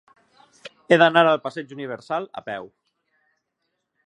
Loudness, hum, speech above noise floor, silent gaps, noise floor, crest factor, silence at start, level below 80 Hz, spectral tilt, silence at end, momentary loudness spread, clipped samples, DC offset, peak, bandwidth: -20 LUFS; none; 57 dB; none; -77 dBFS; 22 dB; 0.65 s; -76 dBFS; -5.5 dB/octave; 1.4 s; 18 LU; under 0.1%; under 0.1%; -2 dBFS; 9.4 kHz